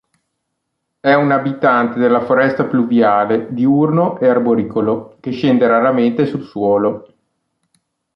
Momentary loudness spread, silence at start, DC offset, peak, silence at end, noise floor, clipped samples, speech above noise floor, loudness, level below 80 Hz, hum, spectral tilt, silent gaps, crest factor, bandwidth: 7 LU; 1.05 s; under 0.1%; -2 dBFS; 1.15 s; -74 dBFS; under 0.1%; 60 dB; -15 LUFS; -58 dBFS; none; -9 dB/octave; none; 14 dB; 5.8 kHz